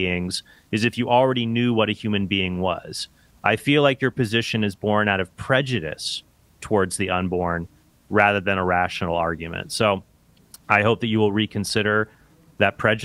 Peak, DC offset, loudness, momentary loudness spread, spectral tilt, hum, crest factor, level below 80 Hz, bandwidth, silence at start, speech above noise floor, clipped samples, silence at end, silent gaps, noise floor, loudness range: 0 dBFS; under 0.1%; -22 LUFS; 10 LU; -5 dB/octave; none; 22 dB; -52 dBFS; 15.5 kHz; 0 s; 29 dB; under 0.1%; 0 s; none; -51 dBFS; 2 LU